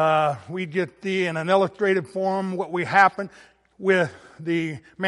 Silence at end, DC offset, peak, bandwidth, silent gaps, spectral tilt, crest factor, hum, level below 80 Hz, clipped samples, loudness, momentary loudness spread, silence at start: 0 s; under 0.1%; -4 dBFS; 11.5 kHz; none; -6 dB/octave; 20 dB; none; -68 dBFS; under 0.1%; -23 LUFS; 11 LU; 0 s